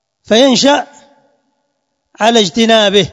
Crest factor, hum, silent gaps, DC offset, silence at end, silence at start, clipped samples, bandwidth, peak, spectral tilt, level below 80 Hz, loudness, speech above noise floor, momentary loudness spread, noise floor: 12 dB; none; none; under 0.1%; 0 s; 0.3 s; 0.3%; 12 kHz; 0 dBFS; -3.5 dB/octave; -52 dBFS; -10 LUFS; 58 dB; 7 LU; -68 dBFS